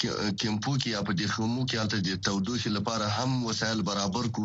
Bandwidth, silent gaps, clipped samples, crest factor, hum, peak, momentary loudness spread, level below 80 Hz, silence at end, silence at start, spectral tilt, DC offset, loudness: 8 kHz; none; under 0.1%; 16 dB; none; -12 dBFS; 1 LU; -56 dBFS; 0 s; 0 s; -4.5 dB/octave; under 0.1%; -29 LUFS